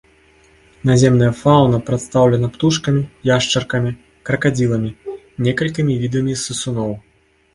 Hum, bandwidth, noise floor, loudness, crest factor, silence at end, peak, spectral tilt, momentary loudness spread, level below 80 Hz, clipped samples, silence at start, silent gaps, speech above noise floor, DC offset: none; 11.5 kHz; -51 dBFS; -17 LUFS; 16 dB; 0.55 s; 0 dBFS; -5.5 dB/octave; 11 LU; -44 dBFS; under 0.1%; 0.85 s; none; 36 dB; under 0.1%